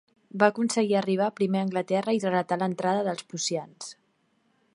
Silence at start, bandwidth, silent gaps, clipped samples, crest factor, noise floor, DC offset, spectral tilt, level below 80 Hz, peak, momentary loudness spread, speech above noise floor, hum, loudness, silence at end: 0.35 s; 11.5 kHz; none; under 0.1%; 22 dB; -69 dBFS; under 0.1%; -5 dB/octave; -76 dBFS; -6 dBFS; 11 LU; 43 dB; none; -26 LUFS; 0.8 s